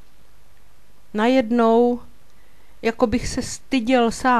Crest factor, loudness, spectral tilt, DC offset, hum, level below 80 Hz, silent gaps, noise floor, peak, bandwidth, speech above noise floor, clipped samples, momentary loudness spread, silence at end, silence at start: 18 dB; -20 LUFS; -4.5 dB/octave; 2%; none; -44 dBFS; none; -55 dBFS; -4 dBFS; 13 kHz; 36 dB; under 0.1%; 11 LU; 0 s; 1.15 s